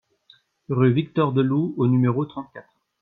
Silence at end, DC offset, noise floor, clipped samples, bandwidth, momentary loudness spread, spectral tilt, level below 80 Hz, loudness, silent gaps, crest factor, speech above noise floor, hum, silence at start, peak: 0.4 s; under 0.1%; -58 dBFS; under 0.1%; 4.2 kHz; 11 LU; -11 dB/octave; -64 dBFS; -22 LUFS; none; 16 dB; 37 dB; none; 0.7 s; -6 dBFS